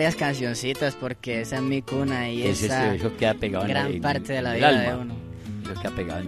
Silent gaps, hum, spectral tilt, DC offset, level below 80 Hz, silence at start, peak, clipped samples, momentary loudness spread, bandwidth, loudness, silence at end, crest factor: none; none; -5 dB/octave; under 0.1%; -48 dBFS; 0 s; -6 dBFS; under 0.1%; 12 LU; 13 kHz; -25 LUFS; 0 s; 20 dB